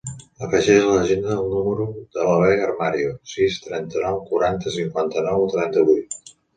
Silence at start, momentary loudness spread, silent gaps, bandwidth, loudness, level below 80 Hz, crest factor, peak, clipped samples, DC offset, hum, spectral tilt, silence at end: 0.05 s; 11 LU; none; 9.4 kHz; -20 LUFS; -50 dBFS; 18 dB; -2 dBFS; under 0.1%; under 0.1%; none; -5.5 dB/octave; 0.25 s